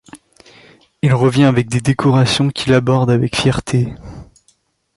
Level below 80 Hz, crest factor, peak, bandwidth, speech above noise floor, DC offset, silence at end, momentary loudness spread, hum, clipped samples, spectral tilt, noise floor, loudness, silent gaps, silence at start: -42 dBFS; 14 dB; -2 dBFS; 11.5 kHz; 45 dB; under 0.1%; 0.75 s; 7 LU; none; under 0.1%; -6 dB/octave; -59 dBFS; -15 LUFS; none; 0.15 s